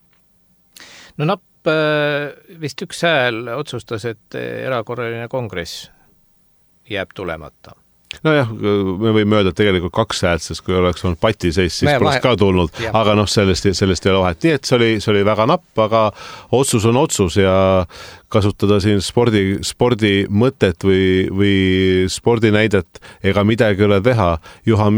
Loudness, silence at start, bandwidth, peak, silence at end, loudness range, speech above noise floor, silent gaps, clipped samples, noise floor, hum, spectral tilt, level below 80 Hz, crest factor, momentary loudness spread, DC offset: -16 LUFS; 0.8 s; over 20 kHz; -2 dBFS; 0 s; 9 LU; 40 dB; none; under 0.1%; -56 dBFS; none; -5.5 dB/octave; -40 dBFS; 16 dB; 12 LU; under 0.1%